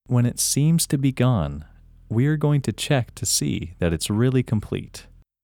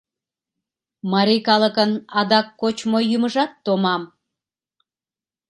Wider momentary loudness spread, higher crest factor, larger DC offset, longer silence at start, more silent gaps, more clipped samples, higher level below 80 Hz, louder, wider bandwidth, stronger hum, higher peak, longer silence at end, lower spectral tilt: first, 11 LU vs 8 LU; second, 14 dB vs 22 dB; neither; second, 0.1 s vs 1.05 s; neither; neither; first, -44 dBFS vs -70 dBFS; second, -22 LUFS vs -19 LUFS; first, 18 kHz vs 11.5 kHz; neither; second, -8 dBFS vs 0 dBFS; second, 0.4 s vs 1.45 s; about the same, -5 dB/octave vs -5.5 dB/octave